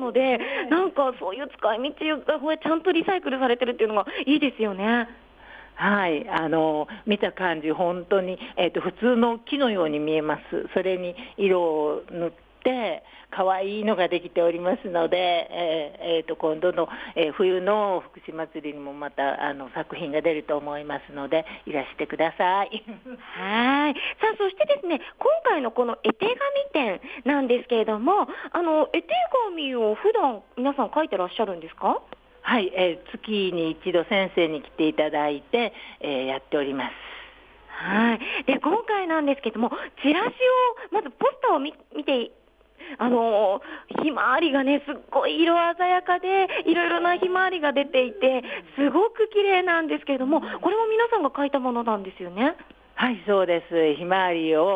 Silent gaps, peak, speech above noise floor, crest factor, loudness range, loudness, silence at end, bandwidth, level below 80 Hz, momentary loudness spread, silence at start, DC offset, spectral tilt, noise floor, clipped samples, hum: none; -8 dBFS; 24 dB; 16 dB; 4 LU; -24 LUFS; 0 s; 5 kHz; -62 dBFS; 9 LU; 0 s; under 0.1%; -7 dB/octave; -48 dBFS; under 0.1%; none